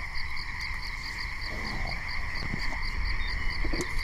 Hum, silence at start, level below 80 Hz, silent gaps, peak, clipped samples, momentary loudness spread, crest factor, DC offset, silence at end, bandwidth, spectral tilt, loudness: none; 0 s; -34 dBFS; none; -16 dBFS; under 0.1%; 3 LU; 14 dB; under 0.1%; 0 s; 14 kHz; -4 dB/octave; -33 LUFS